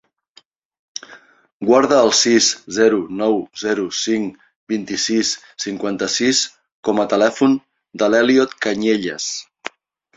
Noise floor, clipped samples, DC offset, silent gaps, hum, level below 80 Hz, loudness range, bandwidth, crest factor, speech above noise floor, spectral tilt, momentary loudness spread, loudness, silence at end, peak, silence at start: -53 dBFS; under 0.1%; under 0.1%; 1.52-1.60 s, 4.56-4.67 s, 6.72-6.83 s; none; -60 dBFS; 4 LU; 8.2 kHz; 18 dB; 36 dB; -2.5 dB/octave; 15 LU; -17 LUFS; 0.5 s; -2 dBFS; 1.1 s